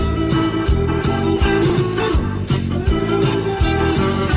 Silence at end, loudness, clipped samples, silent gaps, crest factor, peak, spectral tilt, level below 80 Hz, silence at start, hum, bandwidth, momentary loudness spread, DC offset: 0 s; -18 LUFS; under 0.1%; none; 12 dB; -4 dBFS; -11.5 dB/octave; -24 dBFS; 0 s; none; 4 kHz; 3 LU; under 0.1%